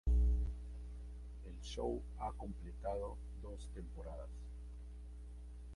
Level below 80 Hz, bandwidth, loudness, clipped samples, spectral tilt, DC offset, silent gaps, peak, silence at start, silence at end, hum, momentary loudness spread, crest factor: -42 dBFS; 11 kHz; -45 LUFS; under 0.1%; -7.5 dB/octave; under 0.1%; none; -26 dBFS; 0.05 s; 0 s; 60 Hz at -50 dBFS; 14 LU; 16 dB